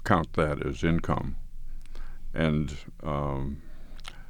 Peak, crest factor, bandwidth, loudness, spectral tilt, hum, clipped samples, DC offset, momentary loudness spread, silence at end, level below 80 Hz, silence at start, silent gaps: -6 dBFS; 22 dB; 10.5 kHz; -30 LUFS; -7 dB/octave; none; under 0.1%; under 0.1%; 20 LU; 0 s; -36 dBFS; 0 s; none